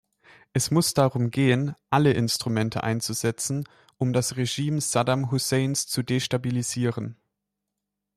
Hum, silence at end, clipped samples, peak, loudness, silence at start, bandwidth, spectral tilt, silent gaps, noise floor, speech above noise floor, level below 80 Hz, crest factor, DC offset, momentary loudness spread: 50 Hz at -50 dBFS; 1.05 s; under 0.1%; -8 dBFS; -25 LUFS; 0.55 s; 14.5 kHz; -5 dB/octave; none; -83 dBFS; 59 dB; -60 dBFS; 18 dB; under 0.1%; 7 LU